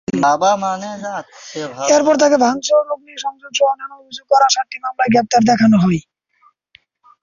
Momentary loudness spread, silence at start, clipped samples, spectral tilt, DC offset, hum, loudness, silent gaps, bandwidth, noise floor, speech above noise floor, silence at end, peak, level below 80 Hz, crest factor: 15 LU; 0.1 s; under 0.1%; -4.5 dB/octave; under 0.1%; none; -15 LUFS; none; 7.4 kHz; -56 dBFS; 41 dB; 1.25 s; 0 dBFS; -54 dBFS; 16 dB